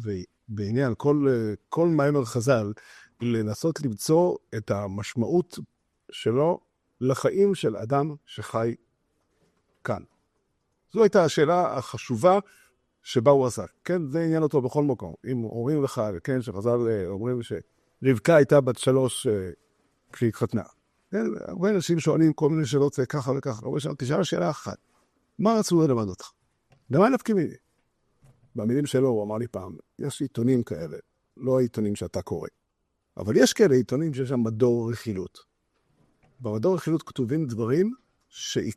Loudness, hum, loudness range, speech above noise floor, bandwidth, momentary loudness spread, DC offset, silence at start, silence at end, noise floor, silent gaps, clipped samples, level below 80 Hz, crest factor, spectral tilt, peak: -25 LUFS; none; 4 LU; 52 dB; 13.5 kHz; 14 LU; under 0.1%; 0 s; 0.05 s; -76 dBFS; none; under 0.1%; -64 dBFS; 20 dB; -6.5 dB/octave; -6 dBFS